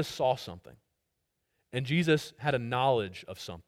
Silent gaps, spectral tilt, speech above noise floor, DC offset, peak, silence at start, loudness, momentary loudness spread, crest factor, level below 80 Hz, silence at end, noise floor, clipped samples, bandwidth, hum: none; -5.5 dB/octave; 51 dB; under 0.1%; -14 dBFS; 0 s; -30 LUFS; 15 LU; 18 dB; -64 dBFS; 0.05 s; -81 dBFS; under 0.1%; 16 kHz; none